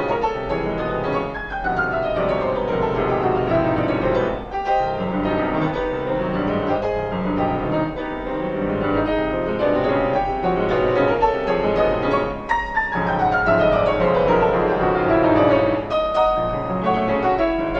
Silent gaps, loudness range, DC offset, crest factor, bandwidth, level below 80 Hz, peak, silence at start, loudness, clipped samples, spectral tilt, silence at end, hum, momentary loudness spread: none; 4 LU; under 0.1%; 16 dB; 7.6 kHz; -38 dBFS; -4 dBFS; 0 s; -20 LUFS; under 0.1%; -8 dB/octave; 0 s; none; 6 LU